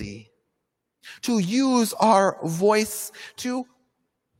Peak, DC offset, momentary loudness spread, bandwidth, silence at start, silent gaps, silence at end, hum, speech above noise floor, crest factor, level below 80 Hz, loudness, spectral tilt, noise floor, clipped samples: -6 dBFS; under 0.1%; 15 LU; 16.5 kHz; 0 s; none; 0.75 s; none; 57 dB; 20 dB; -60 dBFS; -22 LUFS; -4.5 dB/octave; -79 dBFS; under 0.1%